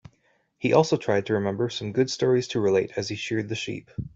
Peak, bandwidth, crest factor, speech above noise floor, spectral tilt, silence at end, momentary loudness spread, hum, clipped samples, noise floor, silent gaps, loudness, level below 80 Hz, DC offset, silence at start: -6 dBFS; 8 kHz; 20 dB; 43 dB; -5.5 dB/octave; 0.1 s; 9 LU; none; under 0.1%; -67 dBFS; none; -25 LUFS; -58 dBFS; under 0.1%; 0.6 s